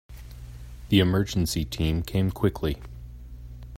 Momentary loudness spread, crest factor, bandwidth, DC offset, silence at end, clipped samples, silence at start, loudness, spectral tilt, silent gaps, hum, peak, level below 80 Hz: 22 LU; 20 dB; 16 kHz; under 0.1%; 0 s; under 0.1%; 0.1 s; -25 LUFS; -6 dB/octave; none; none; -8 dBFS; -40 dBFS